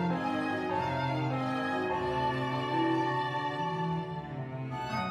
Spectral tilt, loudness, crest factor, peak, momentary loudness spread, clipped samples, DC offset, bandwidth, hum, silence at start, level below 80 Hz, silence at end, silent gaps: -7 dB/octave; -32 LUFS; 14 dB; -18 dBFS; 8 LU; under 0.1%; under 0.1%; 12 kHz; none; 0 s; -60 dBFS; 0 s; none